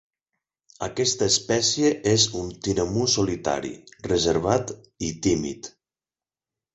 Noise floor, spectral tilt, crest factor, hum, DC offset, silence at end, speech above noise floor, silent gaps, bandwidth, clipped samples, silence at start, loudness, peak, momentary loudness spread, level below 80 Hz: under -90 dBFS; -3.5 dB/octave; 20 dB; none; under 0.1%; 1.05 s; over 66 dB; none; 8.2 kHz; under 0.1%; 0.8 s; -23 LUFS; -6 dBFS; 14 LU; -48 dBFS